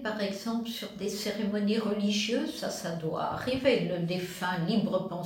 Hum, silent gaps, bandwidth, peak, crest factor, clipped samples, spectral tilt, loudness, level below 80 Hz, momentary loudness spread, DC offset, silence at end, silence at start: none; none; 17 kHz; -12 dBFS; 18 dB; under 0.1%; -5 dB/octave; -31 LUFS; -64 dBFS; 7 LU; under 0.1%; 0 s; 0 s